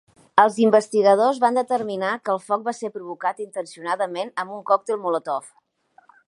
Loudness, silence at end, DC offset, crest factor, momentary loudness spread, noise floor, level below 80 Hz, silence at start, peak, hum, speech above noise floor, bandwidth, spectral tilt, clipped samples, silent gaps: -22 LUFS; 0.8 s; under 0.1%; 22 dB; 13 LU; -58 dBFS; -74 dBFS; 0.35 s; 0 dBFS; none; 37 dB; 11.5 kHz; -5 dB/octave; under 0.1%; none